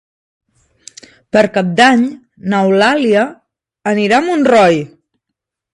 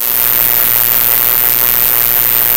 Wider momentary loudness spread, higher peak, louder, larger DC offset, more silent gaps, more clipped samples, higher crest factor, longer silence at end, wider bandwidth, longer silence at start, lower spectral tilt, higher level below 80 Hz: first, 11 LU vs 0 LU; about the same, 0 dBFS vs 0 dBFS; second, -12 LUFS vs -7 LUFS; second, under 0.1% vs 2%; neither; second, under 0.1% vs 2%; about the same, 14 dB vs 10 dB; first, 0.9 s vs 0 s; second, 11.5 kHz vs over 20 kHz; first, 1.35 s vs 0 s; first, -5.5 dB/octave vs -1 dB/octave; second, -58 dBFS vs -44 dBFS